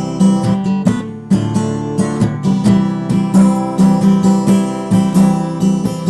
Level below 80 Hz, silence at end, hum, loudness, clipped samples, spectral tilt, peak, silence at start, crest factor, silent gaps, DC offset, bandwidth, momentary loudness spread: -42 dBFS; 0 s; none; -14 LUFS; under 0.1%; -7.5 dB/octave; -4 dBFS; 0 s; 10 dB; none; under 0.1%; 12 kHz; 6 LU